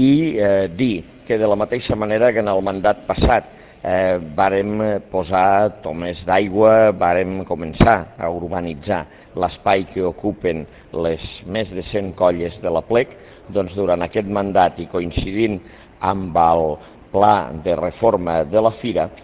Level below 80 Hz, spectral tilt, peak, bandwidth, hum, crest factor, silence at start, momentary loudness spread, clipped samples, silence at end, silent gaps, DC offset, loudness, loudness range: -36 dBFS; -10.5 dB/octave; 0 dBFS; 4 kHz; none; 18 dB; 0 s; 10 LU; under 0.1%; 0.05 s; none; under 0.1%; -19 LUFS; 5 LU